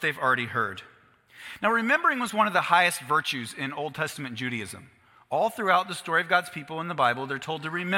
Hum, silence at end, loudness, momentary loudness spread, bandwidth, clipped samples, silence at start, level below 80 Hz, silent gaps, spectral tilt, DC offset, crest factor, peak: none; 0 s; -26 LUFS; 12 LU; 16.5 kHz; under 0.1%; 0 s; -72 dBFS; none; -4 dB/octave; under 0.1%; 22 dB; -6 dBFS